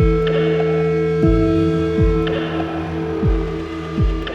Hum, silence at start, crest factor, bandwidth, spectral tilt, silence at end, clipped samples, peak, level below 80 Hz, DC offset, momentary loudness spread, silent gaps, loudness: none; 0 s; 12 dB; 7.6 kHz; -8.5 dB/octave; 0 s; under 0.1%; -4 dBFS; -24 dBFS; under 0.1%; 7 LU; none; -18 LUFS